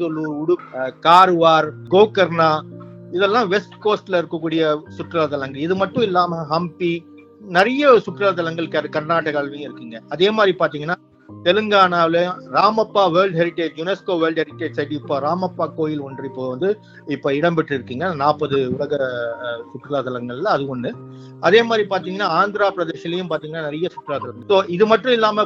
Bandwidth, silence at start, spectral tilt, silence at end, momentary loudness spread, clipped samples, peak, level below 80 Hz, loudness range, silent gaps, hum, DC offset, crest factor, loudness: 9.2 kHz; 0 s; -6.5 dB/octave; 0 s; 13 LU; under 0.1%; 0 dBFS; -64 dBFS; 6 LU; none; none; under 0.1%; 18 dB; -19 LUFS